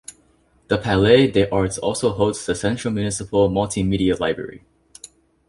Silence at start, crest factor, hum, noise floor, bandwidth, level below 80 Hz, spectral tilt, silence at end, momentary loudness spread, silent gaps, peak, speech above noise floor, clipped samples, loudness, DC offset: 0.1 s; 18 dB; none; -58 dBFS; 11.5 kHz; -42 dBFS; -5.5 dB/octave; 0.45 s; 10 LU; none; -2 dBFS; 39 dB; under 0.1%; -20 LUFS; under 0.1%